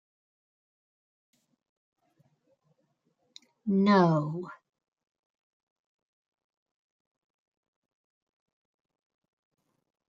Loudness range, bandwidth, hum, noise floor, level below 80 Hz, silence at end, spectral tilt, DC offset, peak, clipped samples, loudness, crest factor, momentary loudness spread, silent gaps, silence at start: 9 LU; 7.2 kHz; none; -76 dBFS; -80 dBFS; 5.55 s; -8 dB/octave; under 0.1%; -8 dBFS; under 0.1%; -25 LUFS; 26 dB; 17 LU; none; 3.65 s